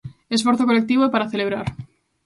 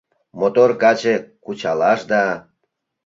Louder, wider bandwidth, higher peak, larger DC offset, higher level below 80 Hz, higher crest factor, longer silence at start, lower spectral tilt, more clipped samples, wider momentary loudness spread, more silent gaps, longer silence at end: second, -20 LUFS vs -17 LUFS; first, 11.5 kHz vs 7.6 kHz; about the same, -4 dBFS vs -2 dBFS; neither; first, -52 dBFS vs -64 dBFS; about the same, 18 dB vs 16 dB; second, 0.05 s vs 0.35 s; about the same, -5 dB/octave vs -5 dB/octave; neither; about the same, 11 LU vs 12 LU; neither; second, 0.4 s vs 0.65 s